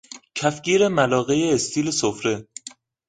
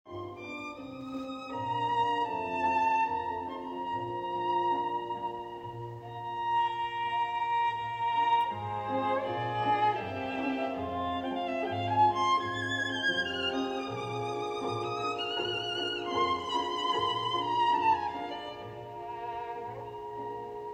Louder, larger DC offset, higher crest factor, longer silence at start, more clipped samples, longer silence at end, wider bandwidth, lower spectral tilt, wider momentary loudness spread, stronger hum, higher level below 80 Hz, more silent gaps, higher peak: first, -21 LUFS vs -31 LUFS; neither; about the same, 18 dB vs 16 dB; about the same, 0.1 s vs 0.05 s; neither; first, 0.4 s vs 0 s; about the same, 9.6 kHz vs 9 kHz; about the same, -4 dB/octave vs -4.5 dB/octave; first, 16 LU vs 13 LU; neither; first, -58 dBFS vs -66 dBFS; neither; first, -4 dBFS vs -14 dBFS